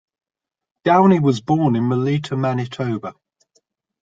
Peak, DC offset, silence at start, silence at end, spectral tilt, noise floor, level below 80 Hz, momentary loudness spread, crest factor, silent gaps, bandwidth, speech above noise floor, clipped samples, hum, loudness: -2 dBFS; under 0.1%; 0.85 s; 0.9 s; -8 dB/octave; -66 dBFS; -58 dBFS; 11 LU; 18 dB; none; 7.8 kHz; 48 dB; under 0.1%; none; -18 LUFS